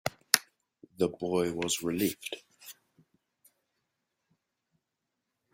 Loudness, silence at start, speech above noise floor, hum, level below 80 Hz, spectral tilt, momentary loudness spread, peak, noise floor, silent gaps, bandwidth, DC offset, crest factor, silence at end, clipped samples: -30 LUFS; 0.05 s; 54 dB; none; -70 dBFS; -3 dB/octave; 21 LU; 0 dBFS; -85 dBFS; none; 16.5 kHz; under 0.1%; 36 dB; 2.8 s; under 0.1%